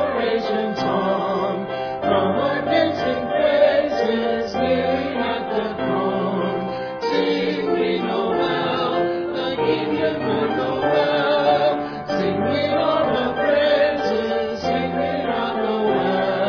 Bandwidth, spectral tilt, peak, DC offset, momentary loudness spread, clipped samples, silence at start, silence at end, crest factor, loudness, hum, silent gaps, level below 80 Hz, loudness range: 5.4 kHz; -6.5 dB/octave; -4 dBFS; under 0.1%; 6 LU; under 0.1%; 0 s; 0 s; 16 dB; -21 LUFS; none; none; -52 dBFS; 3 LU